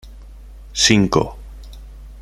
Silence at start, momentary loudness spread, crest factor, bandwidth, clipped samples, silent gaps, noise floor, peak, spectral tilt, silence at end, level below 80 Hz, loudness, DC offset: 0.05 s; 26 LU; 20 dB; 15.5 kHz; under 0.1%; none; -38 dBFS; -2 dBFS; -3.5 dB/octave; 0 s; -36 dBFS; -16 LUFS; under 0.1%